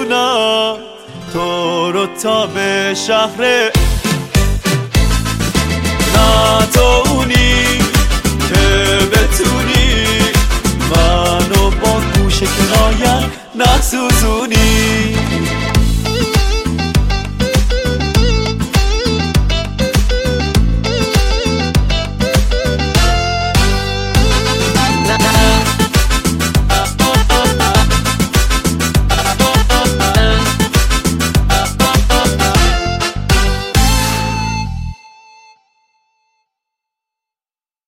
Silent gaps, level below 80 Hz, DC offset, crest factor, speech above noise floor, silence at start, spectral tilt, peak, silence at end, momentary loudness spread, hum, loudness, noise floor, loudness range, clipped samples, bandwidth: none; -18 dBFS; under 0.1%; 12 dB; over 78 dB; 0 s; -4 dB/octave; 0 dBFS; 2.95 s; 5 LU; none; -13 LUFS; under -90 dBFS; 3 LU; under 0.1%; 16.5 kHz